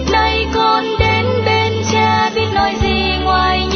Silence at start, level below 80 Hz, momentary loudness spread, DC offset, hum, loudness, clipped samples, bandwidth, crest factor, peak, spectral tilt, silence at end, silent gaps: 0 s; -26 dBFS; 2 LU; under 0.1%; none; -14 LUFS; under 0.1%; 6.6 kHz; 14 dB; -2 dBFS; -5 dB/octave; 0 s; none